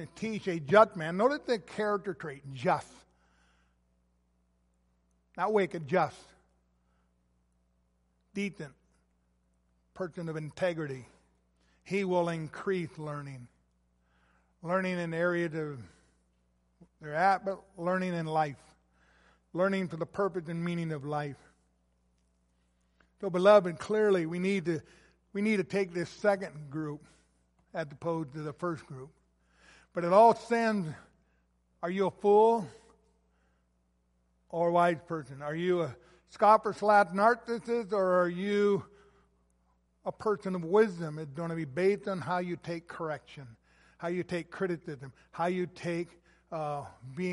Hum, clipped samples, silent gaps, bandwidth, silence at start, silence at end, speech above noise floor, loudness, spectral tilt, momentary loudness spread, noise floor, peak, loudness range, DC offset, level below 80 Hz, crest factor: 60 Hz at -65 dBFS; under 0.1%; none; 11.5 kHz; 0 s; 0 s; 43 dB; -31 LUFS; -6.5 dB/octave; 17 LU; -73 dBFS; -8 dBFS; 11 LU; under 0.1%; -70 dBFS; 24 dB